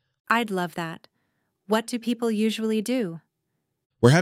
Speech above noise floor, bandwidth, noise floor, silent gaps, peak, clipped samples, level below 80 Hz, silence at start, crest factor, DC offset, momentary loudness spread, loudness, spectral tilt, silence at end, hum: 52 dB; 16 kHz; -78 dBFS; 3.86-3.90 s; -4 dBFS; under 0.1%; -62 dBFS; 0.3 s; 22 dB; under 0.1%; 11 LU; -25 LUFS; -6 dB/octave; 0 s; none